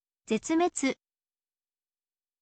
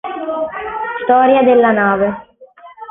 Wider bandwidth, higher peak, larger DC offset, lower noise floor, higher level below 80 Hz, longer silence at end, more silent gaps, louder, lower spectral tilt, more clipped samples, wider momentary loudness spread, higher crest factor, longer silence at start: first, 9 kHz vs 3.8 kHz; second, -16 dBFS vs -2 dBFS; neither; first, under -90 dBFS vs -41 dBFS; second, -72 dBFS vs -52 dBFS; first, 1.5 s vs 0.05 s; neither; second, -29 LUFS vs -14 LUFS; second, -3.5 dB/octave vs -11 dB/octave; neither; second, 7 LU vs 12 LU; first, 18 dB vs 12 dB; first, 0.3 s vs 0.05 s